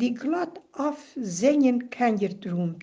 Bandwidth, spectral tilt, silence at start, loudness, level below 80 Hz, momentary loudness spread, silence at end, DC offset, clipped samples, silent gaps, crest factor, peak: 9.6 kHz; -6 dB/octave; 0 s; -26 LUFS; -72 dBFS; 11 LU; 0 s; under 0.1%; under 0.1%; none; 16 dB; -10 dBFS